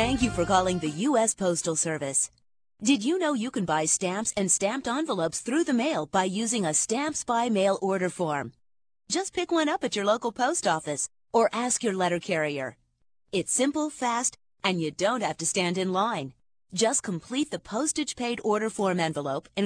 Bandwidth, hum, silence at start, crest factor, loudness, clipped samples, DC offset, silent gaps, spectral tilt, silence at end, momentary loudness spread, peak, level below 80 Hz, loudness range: 10.5 kHz; none; 0 s; 18 dB; -27 LUFS; under 0.1%; under 0.1%; none; -3.5 dB/octave; 0 s; 6 LU; -8 dBFS; -56 dBFS; 2 LU